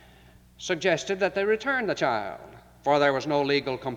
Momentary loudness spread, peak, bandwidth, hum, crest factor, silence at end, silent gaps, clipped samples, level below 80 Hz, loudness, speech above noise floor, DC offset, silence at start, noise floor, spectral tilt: 10 LU; -8 dBFS; 12 kHz; none; 18 dB; 0 s; none; under 0.1%; -60 dBFS; -25 LUFS; 28 dB; under 0.1%; 0.6 s; -54 dBFS; -4.5 dB/octave